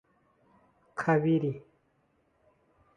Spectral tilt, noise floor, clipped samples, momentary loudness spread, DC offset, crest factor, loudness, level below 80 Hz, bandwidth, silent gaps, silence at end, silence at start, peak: -8.5 dB/octave; -71 dBFS; under 0.1%; 17 LU; under 0.1%; 20 dB; -28 LUFS; -72 dBFS; 9.6 kHz; none; 1.35 s; 0.95 s; -14 dBFS